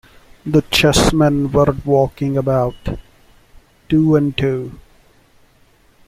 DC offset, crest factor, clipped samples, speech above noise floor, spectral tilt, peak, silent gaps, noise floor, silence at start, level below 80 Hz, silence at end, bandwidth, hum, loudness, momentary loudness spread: under 0.1%; 18 dB; under 0.1%; 37 dB; -5.5 dB/octave; 0 dBFS; none; -52 dBFS; 0.45 s; -34 dBFS; 1.25 s; 16 kHz; none; -16 LUFS; 15 LU